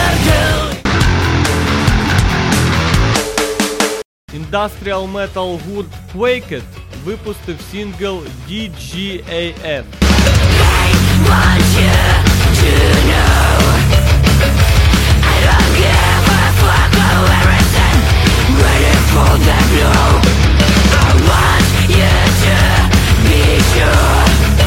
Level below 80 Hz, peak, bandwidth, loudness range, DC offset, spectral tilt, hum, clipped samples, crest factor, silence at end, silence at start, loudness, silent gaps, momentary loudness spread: -16 dBFS; 0 dBFS; 16.5 kHz; 11 LU; under 0.1%; -5 dB/octave; none; under 0.1%; 10 dB; 0 s; 0 s; -11 LUFS; 4.05-4.28 s; 13 LU